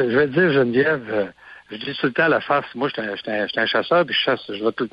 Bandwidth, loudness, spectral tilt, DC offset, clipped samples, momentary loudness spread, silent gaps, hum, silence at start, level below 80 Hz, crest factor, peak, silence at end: 5.6 kHz; -20 LUFS; -7.5 dB/octave; under 0.1%; under 0.1%; 9 LU; none; none; 0 s; -60 dBFS; 14 dB; -6 dBFS; 0.05 s